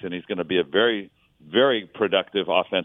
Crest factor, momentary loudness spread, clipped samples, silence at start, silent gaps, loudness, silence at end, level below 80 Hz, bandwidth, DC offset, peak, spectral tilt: 20 dB; 9 LU; under 0.1%; 0.05 s; none; -23 LUFS; 0 s; -66 dBFS; 3.9 kHz; under 0.1%; -4 dBFS; -8 dB/octave